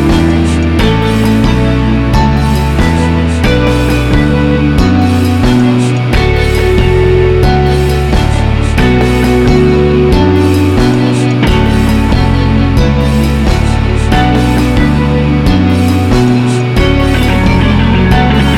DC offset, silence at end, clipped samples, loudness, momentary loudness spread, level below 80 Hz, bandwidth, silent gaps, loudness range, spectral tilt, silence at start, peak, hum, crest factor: under 0.1%; 0 s; under 0.1%; -9 LUFS; 2 LU; -14 dBFS; 15.5 kHz; none; 1 LU; -7 dB/octave; 0 s; 0 dBFS; none; 8 dB